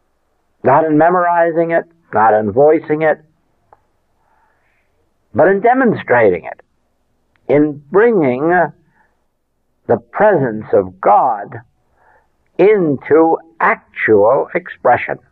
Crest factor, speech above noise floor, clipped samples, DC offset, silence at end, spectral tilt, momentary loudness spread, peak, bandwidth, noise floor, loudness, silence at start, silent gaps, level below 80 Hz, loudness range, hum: 12 dB; 51 dB; under 0.1%; under 0.1%; 0.15 s; -10.5 dB/octave; 9 LU; -2 dBFS; 4.2 kHz; -64 dBFS; -13 LUFS; 0.65 s; none; -58 dBFS; 3 LU; none